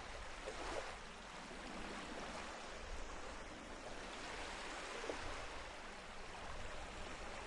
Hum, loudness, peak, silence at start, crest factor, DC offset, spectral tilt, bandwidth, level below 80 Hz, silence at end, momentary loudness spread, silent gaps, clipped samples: none; -49 LUFS; -30 dBFS; 0 s; 18 dB; under 0.1%; -3 dB/octave; 11.5 kHz; -56 dBFS; 0 s; 6 LU; none; under 0.1%